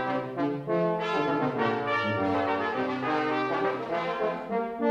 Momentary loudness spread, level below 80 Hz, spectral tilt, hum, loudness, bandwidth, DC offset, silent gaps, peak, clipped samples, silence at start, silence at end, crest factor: 4 LU; -66 dBFS; -7 dB/octave; none; -28 LUFS; 8.8 kHz; under 0.1%; none; -14 dBFS; under 0.1%; 0 s; 0 s; 14 dB